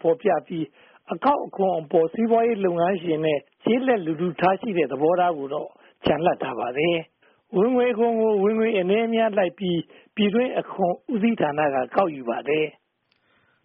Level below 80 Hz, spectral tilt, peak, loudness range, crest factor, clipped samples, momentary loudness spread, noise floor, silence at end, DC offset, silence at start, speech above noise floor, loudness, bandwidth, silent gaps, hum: -62 dBFS; -3 dB/octave; -6 dBFS; 2 LU; 16 dB; under 0.1%; 8 LU; -69 dBFS; 0.95 s; under 0.1%; 0.05 s; 47 dB; -23 LUFS; 3.9 kHz; none; none